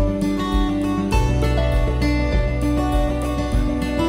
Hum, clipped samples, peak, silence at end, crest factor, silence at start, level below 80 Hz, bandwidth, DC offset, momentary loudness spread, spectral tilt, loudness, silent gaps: none; under 0.1%; -6 dBFS; 0 s; 14 dB; 0 s; -22 dBFS; 15.5 kHz; under 0.1%; 2 LU; -7 dB/octave; -21 LUFS; none